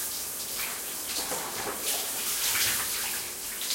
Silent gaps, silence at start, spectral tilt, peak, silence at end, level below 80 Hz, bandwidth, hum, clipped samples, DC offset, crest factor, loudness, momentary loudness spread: none; 0 s; 0.5 dB/octave; -14 dBFS; 0 s; -60 dBFS; 16.5 kHz; none; under 0.1%; under 0.1%; 18 dB; -28 LUFS; 7 LU